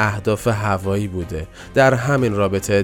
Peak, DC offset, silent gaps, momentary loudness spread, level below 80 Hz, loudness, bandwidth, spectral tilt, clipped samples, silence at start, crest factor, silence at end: -2 dBFS; under 0.1%; none; 11 LU; -40 dBFS; -19 LUFS; 17.5 kHz; -6 dB/octave; under 0.1%; 0 s; 16 dB; 0 s